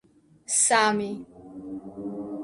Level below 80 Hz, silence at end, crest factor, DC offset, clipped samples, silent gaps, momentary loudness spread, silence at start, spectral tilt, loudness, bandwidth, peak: -64 dBFS; 0 s; 20 dB; under 0.1%; under 0.1%; none; 20 LU; 0.5 s; -2 dB/octave; -23 LUFS; 11.5 kHz; -8 dBFS